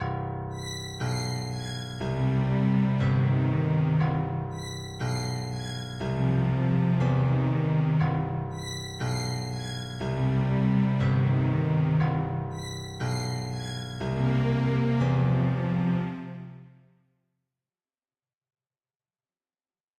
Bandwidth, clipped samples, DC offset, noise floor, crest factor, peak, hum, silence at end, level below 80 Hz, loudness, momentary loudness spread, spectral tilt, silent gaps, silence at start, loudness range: 11 kHz; under 0.1%; under 0.1%; under -90 dBFS; 14 dB; -14 dBFS; none; 3.35 s; -50 dBFS; -27 LUFS; 10 LU; -7 dB/octave; none; 0 s; 2 LU